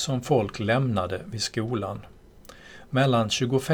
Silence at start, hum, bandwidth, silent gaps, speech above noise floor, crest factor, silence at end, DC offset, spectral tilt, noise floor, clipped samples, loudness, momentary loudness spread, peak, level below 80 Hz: 0 s; none; 18 kHz; none; 24 dB; 18 dB; 0 s; under 0.1%; -5 dB/octave; -49 dBFS; under 0.1%; -26 LUFS; 10 LU; -8 dBFS; -54 dBFS